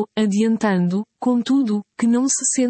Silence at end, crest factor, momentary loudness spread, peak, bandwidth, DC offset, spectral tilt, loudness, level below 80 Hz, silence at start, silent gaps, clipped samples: 0 s; 12 dB; 5 LU; -8 dBFS; 8.8 kHz; under 0.1%; -4.5 dB/octave; -19 LUFS; -68 dBFS; 0 s; none; under 0.1%